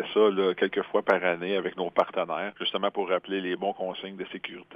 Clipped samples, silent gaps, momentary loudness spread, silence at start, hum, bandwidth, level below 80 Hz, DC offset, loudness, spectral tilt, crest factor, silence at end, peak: under 0.1%; none; 12 LU; 0 s; none; 6 kHz; -76 dBFS; under 0.1%; -28 LUFS; -6.5 dB/octave; 22 dB; 0 s; -6 dBFS